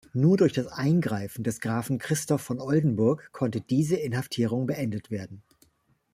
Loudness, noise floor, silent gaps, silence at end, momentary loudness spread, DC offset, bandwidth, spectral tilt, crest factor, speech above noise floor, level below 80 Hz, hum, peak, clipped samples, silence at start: -27 LUFS; -68 dBFS; none; 0.75 s; 8 LU; under 0.1%; 15.5 kHz; -6.5 dB/octave; 18 dB; 42 dB; -62 dBFS; none; -10 dBFS; under 0.1%; 0.15 s